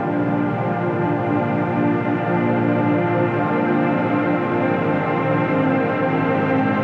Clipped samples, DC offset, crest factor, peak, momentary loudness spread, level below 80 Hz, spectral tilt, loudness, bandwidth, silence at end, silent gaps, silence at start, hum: under 0.1%; under 0.1%; 14 dB; -6 dBFS; 2 LU; -56 dBFS; -9.5 dB/octave; -19 LUFS; 5.6 kHz; 0 s; none; 0 s; none